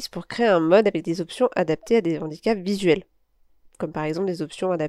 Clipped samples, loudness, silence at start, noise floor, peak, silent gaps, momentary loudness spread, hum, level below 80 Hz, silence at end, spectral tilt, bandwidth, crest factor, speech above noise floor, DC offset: under 0.1%; -23 LUFS; 0 s; -60 dBFS; -4 dBFS; none; 10 LU; none; -58 dBFS; 0 s; -6 dB/octave; 13 kHz; 20 dB; 38 dB; under 0.1%